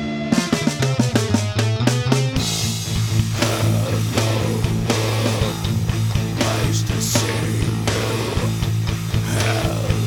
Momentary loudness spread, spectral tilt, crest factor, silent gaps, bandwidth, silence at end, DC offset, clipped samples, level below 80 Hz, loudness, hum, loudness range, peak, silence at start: 3 LU; -5 dB/octave; 18 dB; none; 18 kHz; 0 s; under 0.1%; under 0.1%; -34 dBFS; -20 LUFS; none; 1 LU; 0 dBFS; 0 s